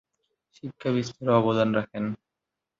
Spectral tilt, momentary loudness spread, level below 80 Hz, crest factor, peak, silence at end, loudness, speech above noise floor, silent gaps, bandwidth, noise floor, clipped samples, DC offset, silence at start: -7 dB/octave; 19 LU; -64 dBFS; 18 dB; -10 dBFS; 0.65 s; -26 LUFS; 61 dB; none; 7.6 kHz; -86 dBFS; under 0.1%; under 0.1%; 0.65 s